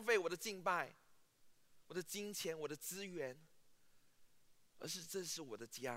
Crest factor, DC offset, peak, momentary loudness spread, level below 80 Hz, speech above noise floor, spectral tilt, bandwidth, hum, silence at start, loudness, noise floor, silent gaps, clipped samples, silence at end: 24 dB; under 0.1%; -22 dBFS; 10 LU; -84 dBFS; 23 dB; -2.5 dB/octave; 16 kHz; none; 0 s; -44 LUFS; -68 dBFS; none; under 0.1%; 0 s